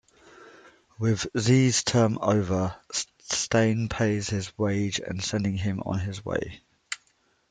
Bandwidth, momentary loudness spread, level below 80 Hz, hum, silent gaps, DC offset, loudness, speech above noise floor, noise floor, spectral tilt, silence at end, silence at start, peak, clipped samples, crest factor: 9.6 kHz; 9 LU; -54 dBFS; none; none; under 0.1%; -26 LUFS; 42 dB; -67 dBFS; -5 dB/octave; 0.55 s; 0.4 s; -8 dBFS; under 0.1%; 18 dB